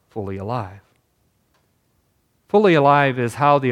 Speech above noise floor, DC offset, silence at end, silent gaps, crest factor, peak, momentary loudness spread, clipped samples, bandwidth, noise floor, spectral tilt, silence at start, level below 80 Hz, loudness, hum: 48 dB; under 0.1%; 0 s; none; 18 dB; -2 dBFS; 15 LU; under 0.1%; 13.5 kHz; -65 dBFS; -7 dB/octave; 0.15 s; -66 dBFS; -18 LUFS; none